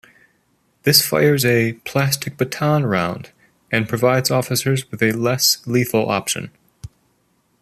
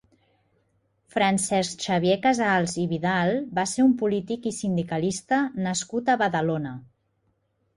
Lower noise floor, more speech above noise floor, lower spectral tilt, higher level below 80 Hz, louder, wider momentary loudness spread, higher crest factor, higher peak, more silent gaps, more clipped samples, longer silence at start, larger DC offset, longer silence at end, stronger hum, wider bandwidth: second, -63 dBFS vs -71 dBFS; about the same, 45 dB vs 47 dB; about the same, -4 dB/octave vs -5 dB/octave; first, -56 dBFS vs -62 dBFS; first, -18 LUFS vs -24 LUFS; about the same, 9 LU vs 7 LU; about the same, 20 dB vs 16 dB; first, 0 dBFS vs -10 dBFS; neither; neither; second, 0.85 s vs 1.15 s; neither; second, 0.75 s vs 0.95 s; neither; first, 14.5 kHz vs 11.5 kHz